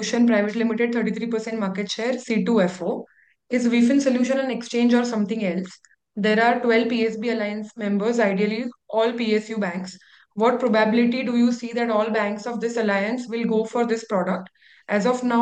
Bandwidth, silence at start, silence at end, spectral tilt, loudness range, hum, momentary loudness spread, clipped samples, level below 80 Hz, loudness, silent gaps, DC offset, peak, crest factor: 8.8 kHz; 0 s; 0 s; -5.5 dB/octave; 2 LU; none; 8 LU; under 0.1%; -72 dBFS; -22 LUFS; none; under 0.1%; -6 dBFS; 16 dB